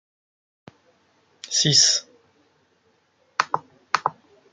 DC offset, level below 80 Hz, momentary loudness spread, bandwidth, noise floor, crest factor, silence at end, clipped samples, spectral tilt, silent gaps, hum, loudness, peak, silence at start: under 0.1%; -68 dBFS; 16 LU; 11 kHz; -65 dBFS; 26 dB; 0.4 s; under 0.1%; -1 dB/octave; none; none; -20 LUFS; 0 dBFS; 1.45 s